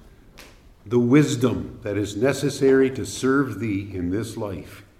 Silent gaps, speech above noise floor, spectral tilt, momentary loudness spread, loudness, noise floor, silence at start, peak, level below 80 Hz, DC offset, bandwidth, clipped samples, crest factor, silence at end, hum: none; 26 dB; -6 dB/octave; 12 LU; -22 LUFS; -47 dBFS; 0.35 s; -6 dBFS; -52 dBFS; under 0.1%; 15 kHz; under 0.1%; 18 dB; 0.2 s; none